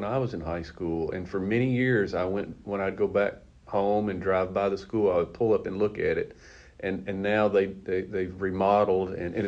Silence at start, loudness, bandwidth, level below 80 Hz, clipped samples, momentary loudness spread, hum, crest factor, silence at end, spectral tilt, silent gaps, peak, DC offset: 0 s; -27 LUFS; 7.8 kHz; -52 dBFS; under 0.1%; 9 LU; none; 18 dB; 0 s; -8 dB/octave; none; -10 dBFS; under 0.1%